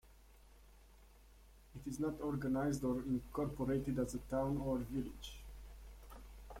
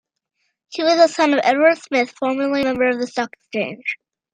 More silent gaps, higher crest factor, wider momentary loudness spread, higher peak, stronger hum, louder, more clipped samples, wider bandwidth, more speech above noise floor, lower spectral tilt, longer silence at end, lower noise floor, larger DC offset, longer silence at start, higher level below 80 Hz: neither; about the same, 16 dB vs 18 dB; first, 19 LU vs 12 LU; second, -26 dBFS vs -2 dBFS; neither; second, -40 LUFS vs -18 LUFS; neither; first, 16.5 kHz vs 9.4 kHz; second, 24 dB vs 54 dB; first, -7 dB/octave vs -3.5 dB/octave; second, 0 s vs 0.4 s; second, -63 dBFS vs -72 dBFS; neither; second, 0.05 s vs 0.7 s; first, -54 dBFS vs -64 dBFS